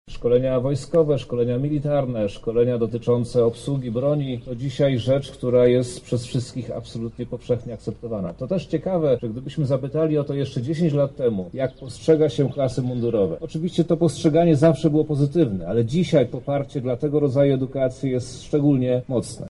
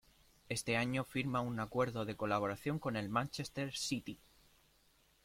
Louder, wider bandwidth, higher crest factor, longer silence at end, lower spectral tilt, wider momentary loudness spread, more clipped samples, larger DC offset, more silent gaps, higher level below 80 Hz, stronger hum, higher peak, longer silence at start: first, -22 LUFS vs -38 LUFS; second, 11.5 kHz vs 16.5 kHz; about the same, 16 dB vs 18 dB; second, 0 s vs 1.1 s; first, -7.5 dB/octave vs -5 dB/octave; about the same, 9 LU vs 7 LU; neither; neither; neither; first, -46 dBFS vs -66 dBFS; neither; first, -6 dBFS vs -22 dBFS; second, 0.05 s vs 0.5 s